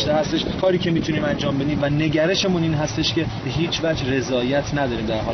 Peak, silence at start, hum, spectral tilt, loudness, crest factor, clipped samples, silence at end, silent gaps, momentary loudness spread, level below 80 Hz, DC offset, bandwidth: -8 dBFS; 0 s; none; -4.5 dB/octave; -21 LUFS; 14 dB; under 0.1%; 0 s; none; 4 LU; -40 dBFS; under 0.1%; 6.6 kHz